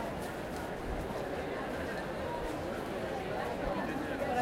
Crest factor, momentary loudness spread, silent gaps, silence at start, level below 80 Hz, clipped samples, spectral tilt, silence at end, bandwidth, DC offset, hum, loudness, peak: 18 dB; 4 LU; none; 0 s; -50 dBFS; under 0.1%; -5.5 dB/octave; 0 s; 16 kHz; under 0.1%; none; -37 LUFS; -18 dBFS